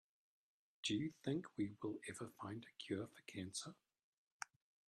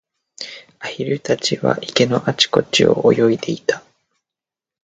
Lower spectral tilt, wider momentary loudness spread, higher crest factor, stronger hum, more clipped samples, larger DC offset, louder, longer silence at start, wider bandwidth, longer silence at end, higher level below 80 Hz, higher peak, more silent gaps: about the same, -4.5 dB/octave vs -4.5 dB/octave; second, 12 LU vs 17 LU; about the same, 22 dB vs 20 dB; neither; neither; neither; second, -48 LUFS vs -17 LUFS; first, 0.85 s vs 0.4 s; first, 13.5 kHz vs 9.2 kHz; second, 0.4 s vs 1.05 s; second, -82 dBFS vs -56 dBFS; second, -28 dBFS vs 0 dBFS; first, 4.04-4.40 s vs none